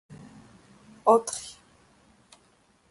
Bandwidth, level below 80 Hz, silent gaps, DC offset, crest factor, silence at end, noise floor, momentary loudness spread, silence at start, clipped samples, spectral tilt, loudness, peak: 11.5 kHz; -70 dBFS; none; under 0.1%; 24 dB; 1.4 s; -63 dBFS; 26 LU; 0.1 s; under 0.1%; -4 dB/octave; -25 LUFS; -6 dBFS